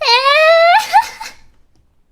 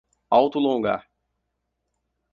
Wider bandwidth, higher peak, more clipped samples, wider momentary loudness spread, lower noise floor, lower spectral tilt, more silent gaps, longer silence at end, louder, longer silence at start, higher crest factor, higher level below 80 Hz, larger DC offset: first, 16 kHz vs 7 kHz; first, 0 dBFS vs -4 dBFS; neither; first, 22 LU vs 8 LU; second, -52 dBFS vs -78 dBFS; second, 1.5 dB/octave vs -7.5 dB/octave; neither; second, 0.8 s vs 1.3 s; first, -10 LUFS vs -22 LUFS; second, 0 s vs 0.3 s; second, 12 dB vs 20 dB; first, -52 dBFS vs -66 dBFS; neither